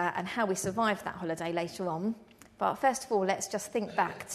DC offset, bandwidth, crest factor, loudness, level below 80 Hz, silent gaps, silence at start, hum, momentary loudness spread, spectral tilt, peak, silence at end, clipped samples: under 0.1%; 13.5 kHz; 18 dB; -32 LUFS; -68 dBFS; none; 0 s; none; 6 LU; -4 dB/octave; -14 dBFS; 0 s; under 0.1%